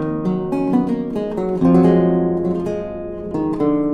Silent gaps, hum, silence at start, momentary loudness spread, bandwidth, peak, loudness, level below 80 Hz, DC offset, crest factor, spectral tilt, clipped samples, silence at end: none; none; 0 s; 12 LU; 6.2 kHz; -2 dBFS; -18 LUFS; -44 dBFS; under 0.1%; 14 dB; -10 dB/octave; under 0.1%; 0 s